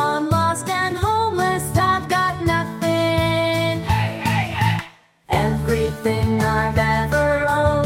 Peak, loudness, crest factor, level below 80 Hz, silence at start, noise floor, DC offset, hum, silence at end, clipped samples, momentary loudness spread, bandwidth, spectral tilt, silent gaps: -4 dBFS; -20 LUFS; 16 dB; -38 dBFS; 0 s; -41 dBFS; under 0.1%; none; 0 s; under 0.1%; 3 LU; 16.5 kHz; -5.5 dB/octave; none